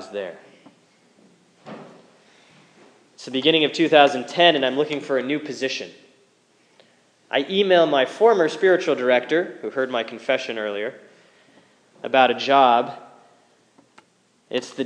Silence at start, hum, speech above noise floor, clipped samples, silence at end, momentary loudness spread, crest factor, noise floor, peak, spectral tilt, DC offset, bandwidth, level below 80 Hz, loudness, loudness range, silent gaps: 0 s; none; 42 dB; under 0.1%; 0 s; 16 LU; 22 dB; -61 dBFS; 0 dBFS; -4 dB/octave; under 0.1%; 10 kHz; -86 dBFS; -20 LUFS; 6 LU; none